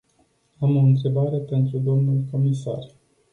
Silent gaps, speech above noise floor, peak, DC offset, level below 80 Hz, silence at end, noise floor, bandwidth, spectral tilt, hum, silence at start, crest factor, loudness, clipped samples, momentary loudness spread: none; 44 dB; -8 dBFS; under 0.1%; -60 dBFS; 0.45 s; -64 dBFS; 6.8 kHz; -10 dB/octave; none; 0.6 s; 14 dB; -22 LUFS; under 0.1%; 9 LU